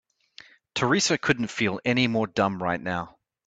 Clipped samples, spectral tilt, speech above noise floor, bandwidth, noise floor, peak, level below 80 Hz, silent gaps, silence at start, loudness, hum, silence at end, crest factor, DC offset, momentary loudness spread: under 0.1%; -4 dB/octave; 27 dB; 9.2 kHz; -52 dBFS; -6 dBFS; -60 dBFS; none; 0.75 s; -25 LUFS; none; 0.4 s; 20 dB; under 0.1%; 10 LU